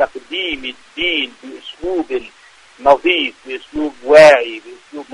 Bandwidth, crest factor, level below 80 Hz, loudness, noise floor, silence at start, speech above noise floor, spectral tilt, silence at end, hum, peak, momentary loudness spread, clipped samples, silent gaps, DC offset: 10.5 kHz; 16 dB; -48 dBFS; -14 LUFS; -45 dBFS; 0 s; 31 dB; -3.5 dB/octave; 0.1 s; none; 0 dBFS; 23 LU; 0.3%; none; under 0.1%